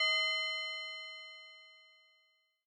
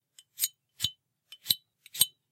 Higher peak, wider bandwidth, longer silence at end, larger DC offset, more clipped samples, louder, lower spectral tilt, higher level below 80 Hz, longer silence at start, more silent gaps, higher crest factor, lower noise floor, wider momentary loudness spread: second, -22 dBFS vs -6 dBFS; second, 10.5 kHz vs 17 kHz; first, 0.85 s vs 0.25 s; neither; neither; second, -35 LUFS vs -30 LUFS; second, 8 dB/octave vs 1.5 dB/octave; second, under -90 dBFS vs -70 dBFS; second, 0 s vs 0.4 s; neither; second, 18 dB vs 30 dB; first, -75 dBFS vs -57 dBFS; first, 22 LU vs 11 LU